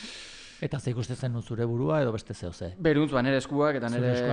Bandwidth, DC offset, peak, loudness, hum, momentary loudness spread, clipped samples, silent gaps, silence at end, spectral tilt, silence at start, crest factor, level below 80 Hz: 10.5 kHz; under 0.1%; -12 dBFS; -28 LUFS; none; 13 LU; under 0.1%; none; 0 s; -7 dB/octave; 0 s; 16 dB; -54 dBFS